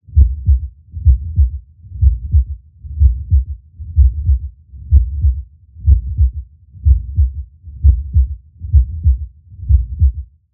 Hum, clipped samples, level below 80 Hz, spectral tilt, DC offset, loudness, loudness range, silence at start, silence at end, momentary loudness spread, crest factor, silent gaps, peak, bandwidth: none; under 0.1%; -16 dBFS; -18.5 dB/octave; under 0.1%; -16 LUFS; 1 LU; 0.1 s; 0.3 s; 17 LU; 14 dB; none; 0 dBFS; 0.5 kHz